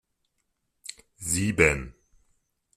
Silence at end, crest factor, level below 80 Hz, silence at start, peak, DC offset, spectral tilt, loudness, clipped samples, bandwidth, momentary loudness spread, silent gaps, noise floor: 0.85 s; 26 dB; -46 dBFS; 0.9 s; -4 dBFS; under 0.1%; -4 dB/octave; -24 LUFS; under 0.1%; 15.5 kHz; 21 LU; none; -77 dBFS